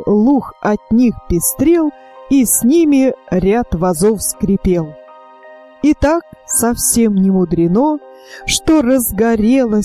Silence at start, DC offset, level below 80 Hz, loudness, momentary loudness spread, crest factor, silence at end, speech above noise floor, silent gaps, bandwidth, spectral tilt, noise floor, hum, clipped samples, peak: 0 s; under 0.1%; -34 dBFS; -13 LUFS; 6 LU; 12 dB; 0 s; 26 dB; none; 16 kHz; -5 dB/octave; -39 dBFS; none; under 0.1%; -2 dBFS